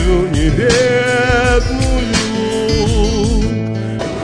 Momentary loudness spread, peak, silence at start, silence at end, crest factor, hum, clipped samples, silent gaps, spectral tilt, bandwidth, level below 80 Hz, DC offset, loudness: 6 LU; 0 dBFS; 0 s; 0 s; 14 dB; none; under 0.1%; none; -5 dB/octave; 11 kHz; -20 dBFS; under 0.1%; -14 LUFS